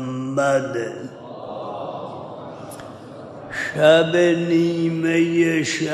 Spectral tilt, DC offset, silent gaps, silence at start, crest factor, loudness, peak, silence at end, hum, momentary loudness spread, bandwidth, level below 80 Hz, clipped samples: -5.5 dB/octave; under 0.1%; none; 0 s; 18 dB; -19 LUFS; -2 dBFS; 0 s; none; 21 LU; 12 kHz; -62 dBFS; under 0.1%